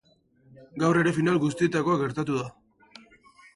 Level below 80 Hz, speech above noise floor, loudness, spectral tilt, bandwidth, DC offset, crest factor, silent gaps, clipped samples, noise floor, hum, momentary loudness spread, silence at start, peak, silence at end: -62 dBFS; 36 dB; -25 LUFS; -6.5 dB/octave; 11.5 kHz; under 0.1%; 18 dB; none; under 0.1%; -61 dBFS; none; 9 LU; 0.6 s; -10 dBFS; 1.05 s